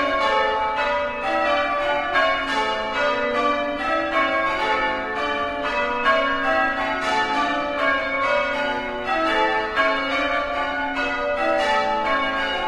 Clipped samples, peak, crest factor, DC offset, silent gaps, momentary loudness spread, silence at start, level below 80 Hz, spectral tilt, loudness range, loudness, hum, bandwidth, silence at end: under 0.1%; -6 dBFS; 16 dB; under 0.1%; none; 4 LU; 0 s; -46 dBFS; -3.5 dB/octave; 1 LU; -21 LUFS; none; 12 kHz; 0 s